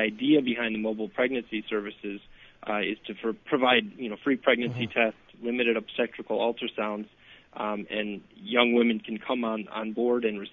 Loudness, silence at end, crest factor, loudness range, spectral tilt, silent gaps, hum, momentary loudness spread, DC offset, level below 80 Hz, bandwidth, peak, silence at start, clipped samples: -28 LUFS; 0.05 s; 22 dB; 4 LU; -7.5 dB/octave; none; none; 13 LU; under 0.1%; -68 dBFS; 4 kHz; -6 dBFS; 0 s; under 0.1%